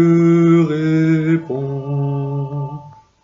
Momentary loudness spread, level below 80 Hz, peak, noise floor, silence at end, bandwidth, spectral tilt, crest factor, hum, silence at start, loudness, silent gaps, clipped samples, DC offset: 13 LU; -58 dBFS; -4 dBFS; -35 dBFS; 0.35 s; 7.4 kHz; -9 dB/octave; 12 dB; none; 0 s; -16 LUFS; none; under 0.1%; under 0.1%